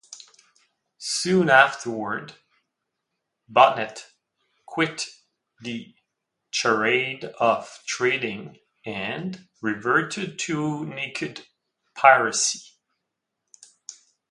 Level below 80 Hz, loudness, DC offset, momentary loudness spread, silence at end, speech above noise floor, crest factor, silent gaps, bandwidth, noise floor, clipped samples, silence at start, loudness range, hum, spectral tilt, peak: -70 dBFS; -23 LUFS; under 0.1%; 23 LU; 0.4 s; 59 dB; 26 dB; none; 11.5 kHz; -81 dBFS; under 0.1%; 0.1 s; 5 LU; none; -3 dB/octave; 0 dBFS